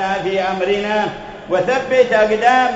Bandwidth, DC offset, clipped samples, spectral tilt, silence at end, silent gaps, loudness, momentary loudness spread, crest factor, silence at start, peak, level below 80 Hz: 7.8 kHz; under 0.1%; under 0.1%; -4.5 dB/octave; 0 s; none; -16 LUFS; 8 LU; 16 dB; 0 s; 0 dBFS; -48 dBFS